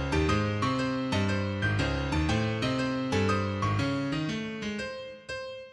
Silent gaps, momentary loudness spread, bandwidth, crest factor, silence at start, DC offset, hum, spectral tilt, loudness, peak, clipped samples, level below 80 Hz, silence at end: none; 10 LU; 11 kHz; 16 dB; 0 s; under 0.1%; none; -6 dB/octave; -29 LUFS; -14 dBFS; under 0.1%; -42 dBFS; 0 s